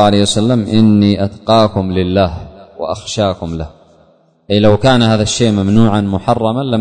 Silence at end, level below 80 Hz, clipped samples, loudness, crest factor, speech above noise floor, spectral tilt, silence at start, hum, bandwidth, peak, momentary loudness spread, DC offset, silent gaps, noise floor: 0 s; -36 dBFS; under 0.1%; -12 LUFS; 12 dB; 38 dB; -6 dB/octave; 0 s; none; 9.6 kHz; 0 dBFS; 12 LU; under 0.1%; none; -50 dBFS